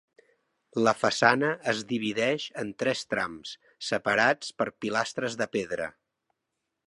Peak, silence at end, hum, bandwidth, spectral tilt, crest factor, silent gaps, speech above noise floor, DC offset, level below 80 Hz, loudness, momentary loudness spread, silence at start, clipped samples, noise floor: -4 dBFS; 0.95 s; none; 11.5 kHz; -4 dB/octave; 24 dB; none; 55 dB; under 0.1%; -68 dBFS; -28 LUFS; 12 LU; 0.75 s; under 0.1%; -83 dBFS